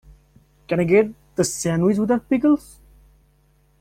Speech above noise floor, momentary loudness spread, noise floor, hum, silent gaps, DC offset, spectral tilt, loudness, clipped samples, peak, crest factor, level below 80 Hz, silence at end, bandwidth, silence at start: 40 dB; 6 LU; -59 dBFS; none; none; under 0.1%; -6 dB/octave; -20 LUFS; under 0.1%; -4 dBFS; 18 dB; -52 dBFS; 1.2 s; 16 kHz; 0.7 s